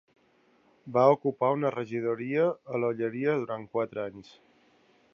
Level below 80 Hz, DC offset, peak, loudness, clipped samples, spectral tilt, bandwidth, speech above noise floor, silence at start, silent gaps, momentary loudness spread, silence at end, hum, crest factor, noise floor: -76 dBFS; under 0.1%; -8 dBFS; -28 LUFS; under 0.1%; -8.5 dB/octave; 7 kHz; 37 dB; 0.85 s; none; 10 LU; 0.9 s; none; 22 dB; -65 dBFS